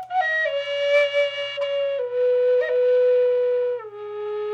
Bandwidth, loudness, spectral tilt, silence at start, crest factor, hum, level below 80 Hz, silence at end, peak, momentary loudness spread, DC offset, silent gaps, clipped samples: 7 kHz; -21 LUFS; -2 dB/octave; 0 s; 12 dB; none; -78 dBFS; 0 s; -8 dBFS; 10 LU; under 0.1%; none; under 0.1%